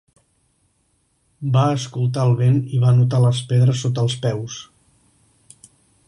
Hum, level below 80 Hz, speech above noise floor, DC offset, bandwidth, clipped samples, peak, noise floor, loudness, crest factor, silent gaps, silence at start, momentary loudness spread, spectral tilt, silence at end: none; -56 dBFS; 48 dB; under 0.1%; 11 kHz; under 0.1%; -6 dBFS; -65 dBFS; -18 LUFS; 14 dB; none; 1.4 s; 11 LU; -7 dB/octave; 1.45 s